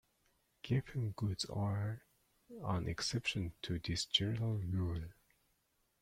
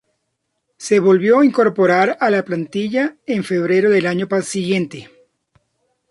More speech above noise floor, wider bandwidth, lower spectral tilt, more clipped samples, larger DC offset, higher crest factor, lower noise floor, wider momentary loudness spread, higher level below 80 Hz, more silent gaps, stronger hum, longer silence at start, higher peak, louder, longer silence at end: second, 41 dB vs 57 dB; first, 15 kHz vs 11.5 kHz; about the same, -5 dB/octave vs -6 dB/octave; neither; neither; first, 22 dB vs 14 dB; first, -79 dBFS vs -73 dBFS; about the same, 12 LU vs 10 LU; about the same, -60 dBFS vs -64 dBFS; neither; neither; second, 0.65 s vs 0.8 s; second, -18 dBFS vs -2 dBFS; second, -39 LUFS vs -16 LUFS; second, 0.9 s vs 1.05 s